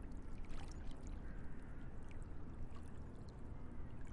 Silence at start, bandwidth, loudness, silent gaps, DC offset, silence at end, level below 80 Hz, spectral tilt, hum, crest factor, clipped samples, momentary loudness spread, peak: 0 s; 10.5 kHz; -54 LUFS; none; under 0.1%; 0 s; -50 dBFS; -7 dB/octave; none; 12 dB; under 0.1%; 2 LU; -34 dBFS